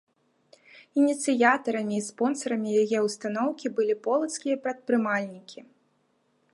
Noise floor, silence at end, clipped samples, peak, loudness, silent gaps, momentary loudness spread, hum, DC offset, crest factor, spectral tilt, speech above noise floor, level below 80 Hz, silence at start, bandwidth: -70 dBFS; 0.95 s; under 0.1%; -6 dBFS; -26 LUFS; none; 8 LU; none; under 0.1%; 22 dB; -4.5 dB/octave; 44 dB; -80 dBFS; 0.75 s; 11.5 kHz